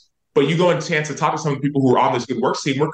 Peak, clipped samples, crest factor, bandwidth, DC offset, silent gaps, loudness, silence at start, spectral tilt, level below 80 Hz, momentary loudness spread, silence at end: -4 dBFS; under 0.1%; 14 dB; 9.2 kHz; under 0.1%; none; -19 LUFS; 0.35 s; -5.5 dB/octave; -62 dBFS; 5 LU; 0 s